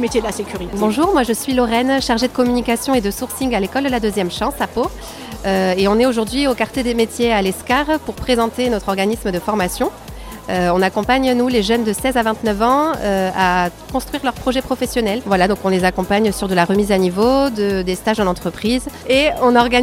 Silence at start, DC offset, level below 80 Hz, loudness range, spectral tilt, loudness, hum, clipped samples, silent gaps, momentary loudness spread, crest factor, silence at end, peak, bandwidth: 0 s; under 0.1%; -36 dBFS; 2 LU; -4.5 dB/octave; -17 LUFS; none; under 0.1%; none; 7 LU; 16 dB; 0 s; -2 dBFS; 16.5 kHz